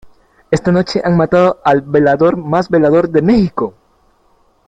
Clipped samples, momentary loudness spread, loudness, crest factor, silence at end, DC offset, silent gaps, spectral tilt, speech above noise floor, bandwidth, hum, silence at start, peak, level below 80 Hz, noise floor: under 0.1%; 6 LU; -13 LUFS; 12 dB; 1 s; under 0.1%; none; -7.5 dB/octave; 42 dB; 9 kHz; none; 0.05 s; 0 dBFS; -42 dBFS; -54 dBFS